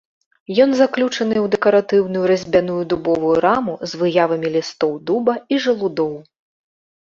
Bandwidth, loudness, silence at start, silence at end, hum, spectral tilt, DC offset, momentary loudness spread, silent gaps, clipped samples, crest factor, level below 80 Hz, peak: 7.6 kHz; -18 LUFS; 0.5 s; 0.9 s; none; -5.5 dB/octave; under 0.1%; 7 LU; none; under 0.1%; 16 dB; -56 dBFS; -2 dBFS